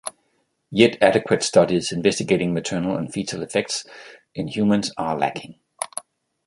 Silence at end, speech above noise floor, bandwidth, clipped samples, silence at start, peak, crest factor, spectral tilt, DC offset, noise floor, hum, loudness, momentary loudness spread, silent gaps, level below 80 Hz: 0.45 s; 48 dB; 12 kHz; under 0.1%; 0.05 s; -2 dBFS; 20 dB; -4.5 dB/octave; under 0.1%; -69 dBFS; none; -21 LUFS; 16 LU; none; -56 dBFS